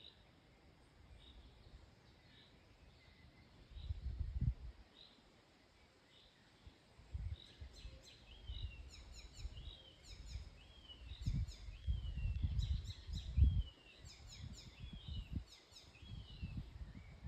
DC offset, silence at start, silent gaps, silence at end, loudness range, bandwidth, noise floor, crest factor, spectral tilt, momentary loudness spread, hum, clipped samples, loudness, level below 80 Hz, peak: under 0.1%; 0 s; none; 0 s; 14 LU; 8.8 kHz; -69 dBFS; 26 dB; -6 dB/octave; 23 LU; none; under 0.1%; -47 LUFS; -48 dBFS; -22 dBFS